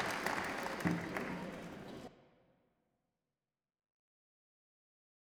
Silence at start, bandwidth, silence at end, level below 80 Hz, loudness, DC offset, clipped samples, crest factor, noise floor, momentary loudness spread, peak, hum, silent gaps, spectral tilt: 0 s; over 20 kHz; 3.1 s; -70 dBFS; -40 LUFS; under 0.1%; under 0.1%; 24 dB; under -90 dBFS; 13 LU; -20 dBFS; none; none; -5 dB/octave